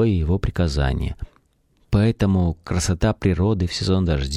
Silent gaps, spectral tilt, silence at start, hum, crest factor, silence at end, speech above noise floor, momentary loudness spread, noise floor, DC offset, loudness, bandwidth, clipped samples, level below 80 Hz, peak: none; -6.5 dB/octave; 0 s; none; 14 dB; 0 s; 42 dB; 6 LU; -61 dBFS; under 0.1%; -21 LUFS; 12.5 kHz; under 0.1%; -30 dBFS; -6 dBFS